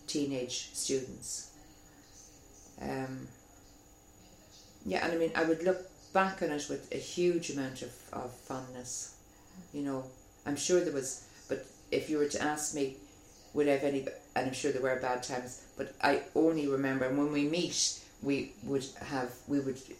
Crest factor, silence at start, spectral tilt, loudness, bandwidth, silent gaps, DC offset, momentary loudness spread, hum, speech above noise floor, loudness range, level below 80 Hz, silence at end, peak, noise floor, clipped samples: 22 dB; 0 s; -3.5 dB/octave; -34 LUFS; 16 kHz; none; under 0.1%; 14 LU; none; 25 dB; 9 LU; -64 dBFS; 0 s; -12 dBFS; -58 dBFS; under 0.1%